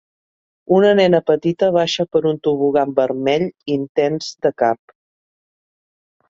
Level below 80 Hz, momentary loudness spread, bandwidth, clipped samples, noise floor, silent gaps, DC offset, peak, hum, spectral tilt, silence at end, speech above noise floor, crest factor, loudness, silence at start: -62 dBFS; 7 LU; 7.6 kHz; under 0.1%; under -90 dBFS; 3.89-3.95 s; under 0.1%; -2 dBFS; none; -6 dB/octave; 1.55 s; over 74 dB; 16 dB; -17 LUFS; 0.7 s